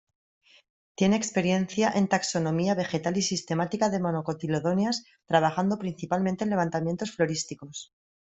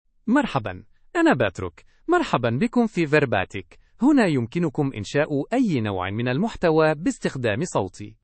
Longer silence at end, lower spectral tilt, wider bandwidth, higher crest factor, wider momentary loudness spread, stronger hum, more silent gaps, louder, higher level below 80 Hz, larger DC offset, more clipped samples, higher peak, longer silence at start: first, 0.4 s vs 0.1 s; second, -5 dB/octave vs -6.5 dB/octave; about the same, 8.2 kHz vs 8.8 kHz; about the same, 22 dB vs 18 dB; second, 7 LU vs 11 LU; neither; neither; second, -27 LUFS vs -22 LUFS; second, -64 dBFS vs -52 dBFS; neither; neither; about the same, -6 dBFS vs -4 dBFS; first, 1 s vs 0.25 s